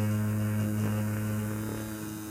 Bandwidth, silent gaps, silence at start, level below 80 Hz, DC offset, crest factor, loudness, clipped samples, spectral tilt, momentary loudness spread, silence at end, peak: 16.5 kHz; none; 0 s; -54 dBFS; under 0.1%; 12 dB; -32 LUFS; under 0.1%; -6.5 dB/octave; 7 LU; 0 s; -18 dBFS